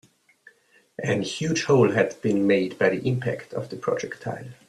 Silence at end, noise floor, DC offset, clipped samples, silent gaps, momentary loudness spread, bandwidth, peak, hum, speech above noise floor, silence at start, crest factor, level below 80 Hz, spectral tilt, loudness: 0.15 s; -60 dBFS; under 0.1%; under 0.1%; none; 13 LU; 12.5 kHz; -6 dBFS; none; 36 dB; 1 s; 18 dB; -62 dBFS; -6 dB/octave; -24 LUFS